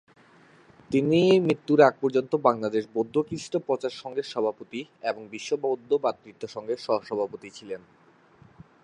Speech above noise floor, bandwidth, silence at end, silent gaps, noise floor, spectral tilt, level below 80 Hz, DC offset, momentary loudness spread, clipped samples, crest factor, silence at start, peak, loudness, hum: 31 dB; 10.5 kHz; 1.05 s; none; -56 dBFS; -6 dB/octave; -68 dBFS; under 0.1%; 18 LU; under 0.1%; 22 dB; 0.9 s; -4 dBFS; -26 LUFS; none